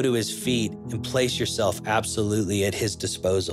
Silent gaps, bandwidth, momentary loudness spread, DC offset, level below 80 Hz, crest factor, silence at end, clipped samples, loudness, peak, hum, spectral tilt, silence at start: none; 15.5 kHz; 3 LU; under 0.1%; -54 dBFS; 16 dB; 0 s; under 0.1%; -25 LUFS; -8 dBFS; none; -4.5 dB/octave; 0 s